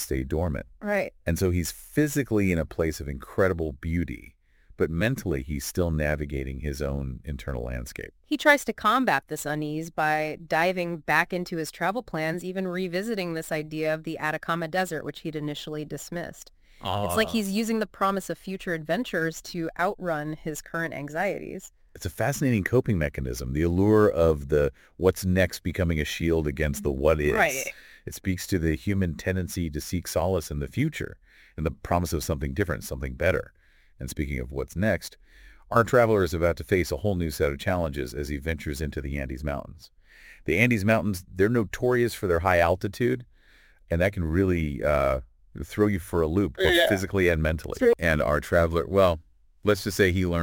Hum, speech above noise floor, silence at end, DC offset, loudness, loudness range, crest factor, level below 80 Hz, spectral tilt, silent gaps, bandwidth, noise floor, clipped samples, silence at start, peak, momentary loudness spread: none; 31 dB; 0 s; under 0.1%; -26 LUFS; 6 LU; 22 dB; -40 dBFS; -5.5 dB/octave; none; 17 kHz; -56 dBFS; under 0.1%; 0 s; -4 dBFS; 11 LU